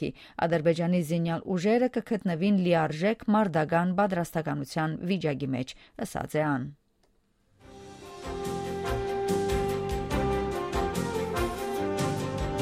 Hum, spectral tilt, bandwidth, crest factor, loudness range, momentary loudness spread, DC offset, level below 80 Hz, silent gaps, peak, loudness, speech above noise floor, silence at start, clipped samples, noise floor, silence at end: none; -6.5 dB/octave; 16 kHz; 18 dB; 8 LU; 10 LU; under 0.1%; -44 dBFS; none; -12 dBFS; -29 LUFS; 41 dB; 0 s; under 0.1%; -68 dBFS; 0 s